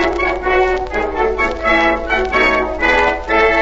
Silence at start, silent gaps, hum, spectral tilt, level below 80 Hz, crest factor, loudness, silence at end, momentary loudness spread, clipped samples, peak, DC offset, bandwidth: 0 s; none; none; -5 dB/octave; -30 dBFS; 14 dB; -14 LUFS; 0 s; 4 LU; under 0.1%; 0 dBFS; under 0.1%; 8 kHz